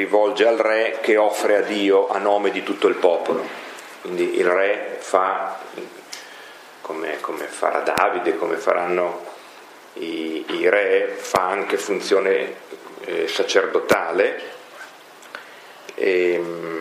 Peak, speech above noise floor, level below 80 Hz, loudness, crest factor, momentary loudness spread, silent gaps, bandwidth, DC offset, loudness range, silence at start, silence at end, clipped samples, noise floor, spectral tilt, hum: 0 dBFS; 23 dB; -68 dBFS; -20 LUFS; 20 dB; 20 LU; none; 15.5 kHz; under 0.1%; 4 LU; 0 s; 0 s; under 0.1%; -43 dBFS; -3.5 dB/octave; none